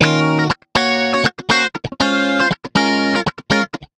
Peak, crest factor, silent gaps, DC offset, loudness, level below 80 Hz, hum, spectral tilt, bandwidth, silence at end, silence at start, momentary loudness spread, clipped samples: 0 dBFS; 16 dB; none; under 0.1%; -16 LUFS; -46 dBFS; none; -4.5 dB/octave; 12 kHz; 0.15 s; 0 s; 3 LU; under 0.1%